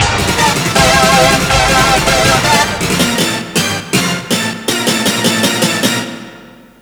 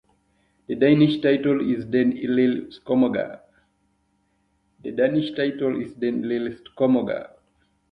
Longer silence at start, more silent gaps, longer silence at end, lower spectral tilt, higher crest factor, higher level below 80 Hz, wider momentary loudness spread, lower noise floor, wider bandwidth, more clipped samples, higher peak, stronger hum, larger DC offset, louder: second, 0 s vs 0.7 s; neither; second, 0.35 s vs 0.65 s; second, -3 dB/octave vs -9 dB/octave; second, 12 dB vs 18 dB; first, -30 dBFS vs -62 dBFS; second, 6 LU vs 13 LU; second, -37 dBFS vs -68 dBFS; first, over 20 kHz vs 5.2 kHz; first, 0.1% vs under 0.1%; first, 0 dBFS vs -4 dBFS; neither; neither; first, -11 LUFS vs -22 LUFS